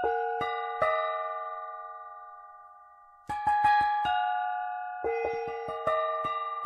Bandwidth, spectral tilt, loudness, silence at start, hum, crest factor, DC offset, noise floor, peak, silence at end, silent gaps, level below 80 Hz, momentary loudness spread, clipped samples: 10.5 kHz; -4.5 dB/octave; -30 LUFS; 0 s; none; 18 dB; under 0.1%; -55 dBFS; -14 dBFS; 0 s; none; -62 dBFS; 19 LU; under 0.1%